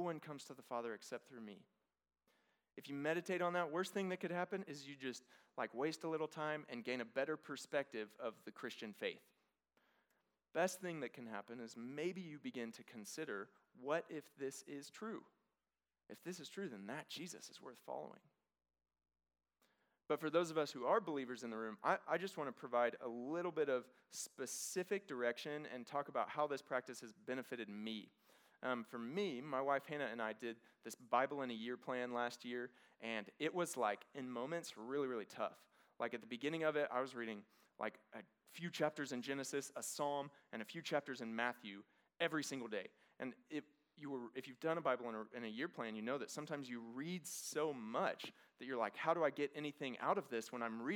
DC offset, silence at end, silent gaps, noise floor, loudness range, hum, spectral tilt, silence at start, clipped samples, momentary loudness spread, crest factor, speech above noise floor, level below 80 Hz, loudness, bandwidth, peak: under 0.1%; 0 s; none; under -90 dBFS; 7 LU; none; -4 dB/octave; 0 s; under 0.1%; 12 LU; 24 dB; over 46 dB; under -90 dBFS; -44 LUFS; over 20 kHz; -22 dBFS